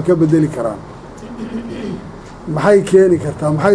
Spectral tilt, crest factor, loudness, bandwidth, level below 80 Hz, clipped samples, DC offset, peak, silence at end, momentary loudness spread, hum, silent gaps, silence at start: -7.5 dB/octave; 14 dB; -15 LUFS; 10.5 kHz; -42 dBFS; under 0.1%; under 0.1%; 0 dBFS; 0 s; 21 LU; none; none; 0 s